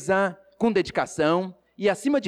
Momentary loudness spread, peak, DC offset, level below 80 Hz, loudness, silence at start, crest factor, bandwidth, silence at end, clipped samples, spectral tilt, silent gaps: 5 LU; -12 dBFS; under 0.1%; -58 dBFS; -25 LUFS; 0 s; 12 dB; 13 kHz; 0 s; under 0.1%; -5.5 dB/octave; none